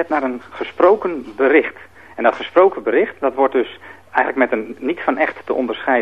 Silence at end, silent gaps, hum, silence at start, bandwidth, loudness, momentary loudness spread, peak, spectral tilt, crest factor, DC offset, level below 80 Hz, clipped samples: 0 s; none; none; 0 s; 6.6 kHz; -18 LUFS; 12 LU; 0 dBFS; -6 dB/octave; 18 dB; 0.3%; -60 dBFS; under 0.1%